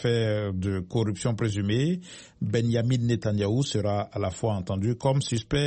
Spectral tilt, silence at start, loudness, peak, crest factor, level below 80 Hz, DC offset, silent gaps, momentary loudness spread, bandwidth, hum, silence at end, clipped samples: -6.5 dB/octave; 0 s; -27 LUFS; -12 dBFS; 14 dB; -52 dBFS; under 0.1%; none; 4 LU; 8.8 kHz; none; 0 s; under 0.1%